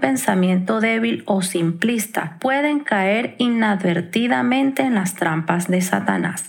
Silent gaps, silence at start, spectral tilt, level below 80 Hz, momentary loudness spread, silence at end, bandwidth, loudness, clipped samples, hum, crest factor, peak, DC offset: none; 0 s; -5 dB/octave; -76 dBFS; 3 LU; 0 s; 19 kHz; -19 LUFS; under 0.1%; none; 18 dB; -2 dBFS; under 0.1%